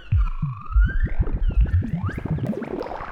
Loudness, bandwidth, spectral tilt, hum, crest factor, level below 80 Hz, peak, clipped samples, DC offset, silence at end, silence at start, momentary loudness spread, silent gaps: -25 LUFS; 5.2 kHz; -9.5 dB/octave; none; 12 dB; -24 dBFS; -8 dBFS; under 0.1%; under 0.1%; 0 s; 0 s; 7 LU; none